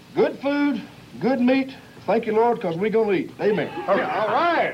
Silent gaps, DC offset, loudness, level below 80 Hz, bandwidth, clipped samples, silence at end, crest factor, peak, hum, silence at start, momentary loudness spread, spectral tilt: none; under 0.1%; -22 LUFS; -62 dBFS; 12.5 kHz; under 0.1%; 0 s; 14 dB; -8 dBFS; none; 0.1 s; 7 LU; -7 dB/octave